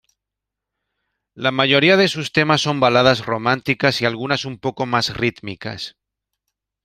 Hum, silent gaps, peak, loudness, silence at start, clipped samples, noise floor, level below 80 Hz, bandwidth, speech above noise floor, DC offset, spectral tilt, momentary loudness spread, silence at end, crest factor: none; none; -2 dBFS; -17 LUFS; 1.35 s; under 0.1%; -84 dBFS; -54 dBFS; 15.5 kHz; 66 dB; under 0.1%; -5 dB/octave; 15 LU; 0.95 s; 18 dB